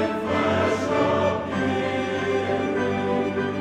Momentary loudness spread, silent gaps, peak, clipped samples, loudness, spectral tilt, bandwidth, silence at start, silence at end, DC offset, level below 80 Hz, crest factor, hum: 4 LU; none; -10 dBFS; under 0.1%; -23 LUFS; -6 dB/octave; 11.5 kHz; 0 s; 0 s; under 0.1%; -54 dBFS; 14 dB; none